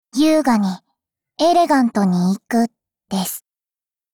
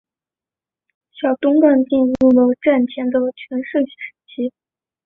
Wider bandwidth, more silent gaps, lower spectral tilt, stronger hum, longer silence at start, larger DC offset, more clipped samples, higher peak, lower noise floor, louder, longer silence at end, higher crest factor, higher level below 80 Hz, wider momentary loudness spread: first, 20 kHz vs 3.9 kHz; neither; second, -5.5 dB/octave vs -8 dB/octave; neither; second, 0.15 s vs 1.2 s; neither; neither; second, -6 dBFS vs -2 dBFS; about the same, under -90 dBFS vs -90 dBFS; about the same, -18 LUFS vs -17 LUFS; first, 0.75 s vs 0.55 s; about the same, 14 dB vs 16 dB; about the same, -60 dBFS vs -56 dBFS; about the same, 12 LU vs 13 LU